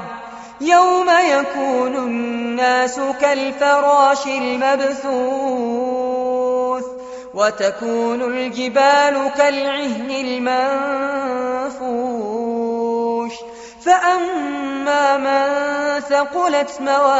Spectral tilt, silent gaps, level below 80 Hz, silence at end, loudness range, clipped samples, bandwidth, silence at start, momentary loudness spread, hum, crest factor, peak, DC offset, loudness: -1 dB/octave; none; -60 dBFS; 0 s; 4 LU; under 0.1%; 8 kHz; 0 s; 9 LU; none; 16 dB; -2 dBFS; under 0.1%; -18 LUFS